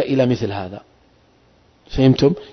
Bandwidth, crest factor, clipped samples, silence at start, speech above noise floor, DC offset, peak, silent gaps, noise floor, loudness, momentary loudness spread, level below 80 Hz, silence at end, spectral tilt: 6.4 kHz; 16 dB; under 0.1%; 0 s; 37 dB; under 0.1%; -2 dBFS; none; -55 dBFS; -18 LUFS; 18 LU; -40 dBFS; 0.05 s; -7.5 dB/octave